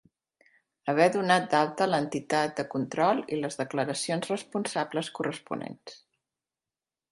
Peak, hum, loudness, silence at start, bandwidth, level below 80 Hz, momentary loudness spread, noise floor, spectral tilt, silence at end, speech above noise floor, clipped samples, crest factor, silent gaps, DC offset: -8 dBFS; none; -28 LUFS; 0.85 s; 11.5 kHz; -74 dBFS; 13 LU; under -90 dBFS; -4.5 dB/octave; 1.15 s; over 62 dB; under 0.1%; 22 dB; none; under 0.1%